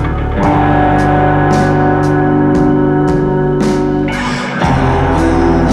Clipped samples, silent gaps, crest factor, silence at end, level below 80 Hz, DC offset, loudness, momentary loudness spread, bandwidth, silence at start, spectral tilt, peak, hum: under 0.1%; none; 10 dB; 0 s; -22 dBFS; under 0.1%; -12 LUFS; 4 LU; 11 kHz; 0 s; -7.5 dB/octave; 0 dBFS; none